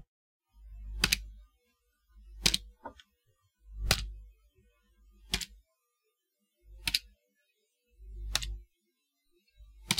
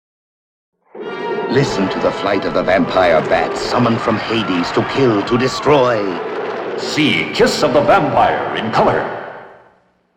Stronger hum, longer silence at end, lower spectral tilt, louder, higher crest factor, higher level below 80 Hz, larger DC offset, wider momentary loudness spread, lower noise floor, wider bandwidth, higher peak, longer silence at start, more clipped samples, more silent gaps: neither; second, 0 s vs 0.65 s; second, -1.5 dB/octave vs -5.5 dB/octave; second, -32 LUFS vs -15 LUFS; first, 32 dB vs 16 dB; about the same, -46 dBFS vs -44 dBFS; neither; first, 24 LU vs 10 LU; first, -82 dBFS vs -54 dBFS; about the same, 16.5 kHz vs 16 kHz; second, -6 dBFS vs 0 dBFS; second, 0.55 s vs 0.95 s; neither; neither